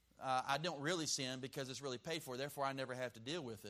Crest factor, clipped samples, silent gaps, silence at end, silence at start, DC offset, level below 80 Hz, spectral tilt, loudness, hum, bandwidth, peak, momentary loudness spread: 22 dB; under 0.1%; none; 0 s; 0.2 s; under 0.1%; -78 dBFS; -3 dB/octave; -42 LUFS; none; 15.5 kHz; -22 dBFS; 7 LU